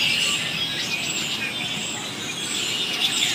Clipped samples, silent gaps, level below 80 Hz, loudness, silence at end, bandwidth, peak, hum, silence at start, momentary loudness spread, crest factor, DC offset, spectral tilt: under 0.1%; none; -60 dBFS; -23 LUFS; 0 s; 15.5 kHz; -8 dBFS; none; 0 s; 7 LU; 18 dB; under 0.1%; -1 dB/octave